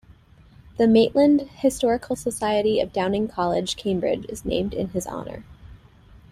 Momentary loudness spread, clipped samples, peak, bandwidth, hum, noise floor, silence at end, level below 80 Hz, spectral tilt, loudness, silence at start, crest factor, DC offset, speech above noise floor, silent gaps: 12 LU; under 0.1%; -6 dBFS; 14.5 kHz; none; -51 dBFS; 0.55 s; -48 dBFS; -5.5 dB/octave; -22 LUFS; 0.1 s; 18 dB; under 0.1%; 29 dB; none